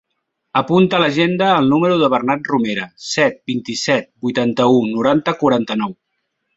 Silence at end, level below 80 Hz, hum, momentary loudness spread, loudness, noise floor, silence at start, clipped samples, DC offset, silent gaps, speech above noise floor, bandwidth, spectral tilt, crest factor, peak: 0.65 s; -58 dBFS; none; 8 LU; -16 LUFS; -73 dBFS; 0.55 s; under 0.1%; under 0.1%; none; 57 dB; 8 kHz; -5.5 dB/octave; 16 dB; -2 dBFS